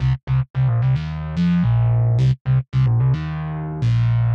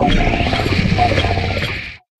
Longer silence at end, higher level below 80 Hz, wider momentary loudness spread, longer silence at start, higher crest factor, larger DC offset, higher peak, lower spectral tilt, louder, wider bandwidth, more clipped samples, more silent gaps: second, 0 s vs 0.2 s; second, -34 dBFS vs -24 dBFS; about the same, 6 LU vs 6 LU; about the same, 0 s vs 0 s; second, 8 dB vs 14 dB; neither; second, -10 dBFS vs -2 dBFS; first, -9.5 dB/octave vs -6 dB/octave; about the same, -19 LUFS vs -17 LUFS; second, 5.6 kHz vs 12 kHz; neither; first, 0.23-0.27 s, 0.50-0.54 s, 2.41-2.45 s vs none